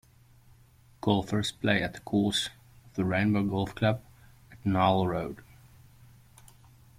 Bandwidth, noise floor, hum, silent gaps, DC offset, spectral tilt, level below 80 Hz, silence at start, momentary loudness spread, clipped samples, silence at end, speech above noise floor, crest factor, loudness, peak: 16 kHz; -59 dBFS; none; none; under 0.1%; -5.5 dB/octave; -56 dBFS; 1.05 s; 11 LU; under 0.1%; 1.6 s; 31 dB; 20 dB; -29 LUFS; -10 dBFS